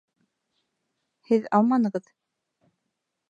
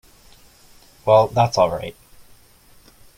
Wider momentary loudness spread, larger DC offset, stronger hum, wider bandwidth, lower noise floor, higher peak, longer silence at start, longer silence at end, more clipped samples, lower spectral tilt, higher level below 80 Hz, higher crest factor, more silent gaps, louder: second, 8 LU vs 15 LU; neither; neither; second, 7.8 kHz vs 16.5 kHz; first, -81 dBFS vs -51 dBFS; second, -6 dBFS vs -2 dBFS; first, 1.3 s vs 1.05 s; about the same, 1.3 s vs 1.25 s; neither; first, -8.5 dB/octave vs -5.5 dB/octave; second, -78 dBFS vs -52 dBFS; about the same, 22 dB vs 20 dB; neither; second, -23 LUFS vs -18 LUFS